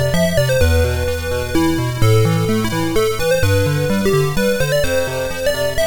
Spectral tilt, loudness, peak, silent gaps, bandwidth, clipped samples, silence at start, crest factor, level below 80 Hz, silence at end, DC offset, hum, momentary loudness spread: -5.5 dB/octave; -17 LUFS; -2 dBFS; none; 19 kHz; under 0.1%; 0 s; 14 dB; -28 dBFS; 0 s; under 0.1%; none; 5 LU